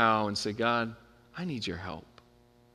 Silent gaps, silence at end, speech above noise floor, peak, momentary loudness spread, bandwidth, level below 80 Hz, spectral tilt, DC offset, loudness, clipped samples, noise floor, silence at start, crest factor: none; 0.75 s; 31 dB; -10 dBFS; 17 LU; 13 kHz; -64 dBFS; -4.5 dB/octave; under 0.1%; -32 LUFS; under 0.1%; -62 dBFS; 0 s; 24 dB